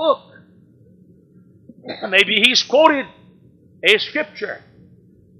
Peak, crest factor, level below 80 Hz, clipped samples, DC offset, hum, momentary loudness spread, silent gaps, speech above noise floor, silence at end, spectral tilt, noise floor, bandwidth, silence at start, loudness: 0 dBFS; 20 dB; -64 dBFS; under 0.1%; under 0.1%; none; 19 LU; none; 33 dB; 0.8 s; -2 dB/octave; -50 dBFS; 16 kHz; 0 s; -15 LUFS